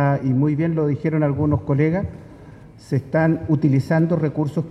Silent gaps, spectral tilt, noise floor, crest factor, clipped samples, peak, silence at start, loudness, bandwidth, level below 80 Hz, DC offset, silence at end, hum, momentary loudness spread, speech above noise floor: none; -10 dB/octave; -42 dBFS; 14 dB; under 0.1%; -6 dBFS; 0 s; -20 LUFS; 8 kHz; -46 dBFS; under 0.1%; 0 s; none; 7 LU; 22 dB